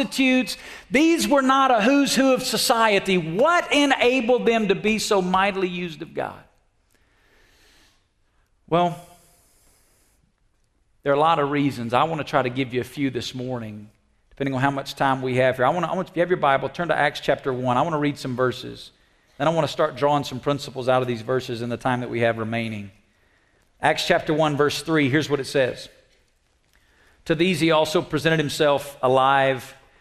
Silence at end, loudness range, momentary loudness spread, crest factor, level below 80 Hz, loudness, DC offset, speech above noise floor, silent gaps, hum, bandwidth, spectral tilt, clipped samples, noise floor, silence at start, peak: 0.25 s; 11 LU; 12 LU; 20 dB; -56 dBFS; -21 LUFS; under 0.1%; 44 dB; none; none; 14 kHz; -5 dB/octave; under 0.1%; -65 dBFS; 0 s; -4 dBFS